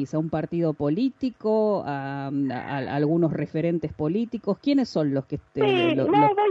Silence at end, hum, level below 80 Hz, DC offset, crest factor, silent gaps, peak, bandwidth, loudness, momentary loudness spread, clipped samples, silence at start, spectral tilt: 0 s; none; -58 dBFS; under 0.1%; 16 dB; none; -8 dBFS; 7.6 kHz; -25 LUFS; 8 LU; under 0.1%; 0 s; -8 dB/octave